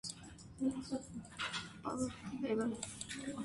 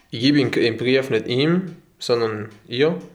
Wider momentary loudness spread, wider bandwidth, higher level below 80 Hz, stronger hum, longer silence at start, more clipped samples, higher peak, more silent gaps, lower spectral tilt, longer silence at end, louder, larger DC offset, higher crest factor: second, 9 LU vs 12 LU; second, 11.5 kHz vs 14 kHz; about the same, -64 dBFS vs -64 dBFS; neither; about the same, 0.05 s vs 0.1 s; neither; second, -26 dBFS vs -4 dBFS; neither; second, -4 dB/octave vs -6 dB/octave; about the same, 0 s vs 0.05 s; second, -41 LUFS vs -20 LUFS; neither; about the same, 16 dB vs 16 dB